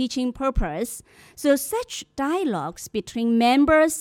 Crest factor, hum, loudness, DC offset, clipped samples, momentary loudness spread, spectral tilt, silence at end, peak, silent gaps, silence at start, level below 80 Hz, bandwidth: 16 dB; none; -23 LUFS; under 0.1%; under 0.1%; 13 LU; -4 dB/octave; 0 s; -6 dBFS; none; 0 s; -38 dBFS; 17.5 kHz